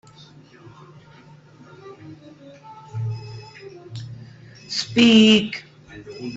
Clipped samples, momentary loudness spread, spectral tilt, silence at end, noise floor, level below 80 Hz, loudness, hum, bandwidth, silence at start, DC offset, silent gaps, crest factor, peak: under 0.1%; 29 LU; -5 dB/octave; 0 s; -48 dBFS; -60 dBFS; -17 LUFS; none; 8 kHz; 1.85 s; under 0.1%; none; 20 dB; -4 dBFS